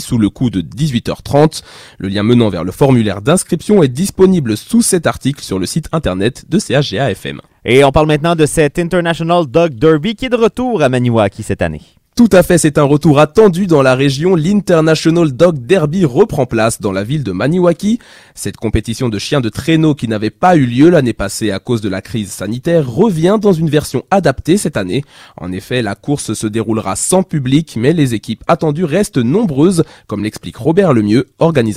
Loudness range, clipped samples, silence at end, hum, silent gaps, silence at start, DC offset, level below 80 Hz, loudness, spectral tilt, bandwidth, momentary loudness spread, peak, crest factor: 5 LU; 0.2%; 0 s; none; none; 0 s; under 0.1%; -36 dBFS; -13 LUFS; -6 dB/octave; 16 kHz; 9 LU; 0 dBFS; 12 dB